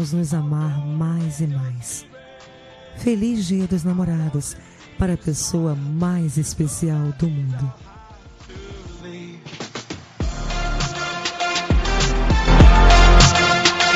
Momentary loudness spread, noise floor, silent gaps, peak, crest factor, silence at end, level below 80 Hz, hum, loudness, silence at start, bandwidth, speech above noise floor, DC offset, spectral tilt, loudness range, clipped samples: 22 LU; -43 dBFS; none; -2 dBFS; 18 dB; 0 s; -22 dBFS; none; -19 LUFS; 0 s; 13 kHz; 21 dB; under 0.1%; -4.5 dB/octave; 13 LU; under 0.1%